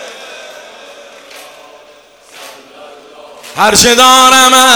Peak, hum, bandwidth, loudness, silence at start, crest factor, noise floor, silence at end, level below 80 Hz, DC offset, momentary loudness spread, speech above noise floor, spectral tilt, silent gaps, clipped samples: 0 dBFS; none; over 20 kHz; -4 LUFS; 0 s; 12 dB; -40 dBFS; 0 s; -42 dBFS; under 0.1%; 25 LU; 35 dB; -0.5 dB/octave; none; 1%